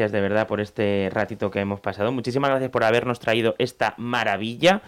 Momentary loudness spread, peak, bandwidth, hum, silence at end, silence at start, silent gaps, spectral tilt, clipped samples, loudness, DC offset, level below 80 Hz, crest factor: 5 LU; -8 dBFS; 15.5 kHz; none; 0 s; 0 s; none; -5.5 dB/octave; under 0.1%; -23 LUFS; under 0.1%; -60 dBFS; 14 dB